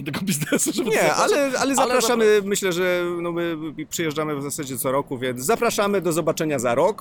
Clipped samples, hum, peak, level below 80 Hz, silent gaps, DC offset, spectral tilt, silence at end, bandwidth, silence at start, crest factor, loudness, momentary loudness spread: under 0.1%; none; -6 dBFS; -58 dBFS; none; under 0.1%; -4 dB/octave; 0.05 s; 19 kHz; 0 s; 14 dB; -21 LUFS; 8 LU